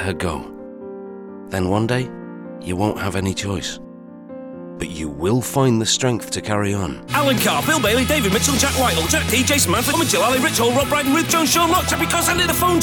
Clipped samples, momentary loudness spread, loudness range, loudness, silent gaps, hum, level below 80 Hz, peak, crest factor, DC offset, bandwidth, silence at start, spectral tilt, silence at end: under 0.1%; 18 LU; 8 LU; -18 LUFS; none; none; -38 dBFS; -2 dBFS; 18 dB; under 0.1%; 19.5 kHz; 0 s; -3.5 dB/octave; 0 s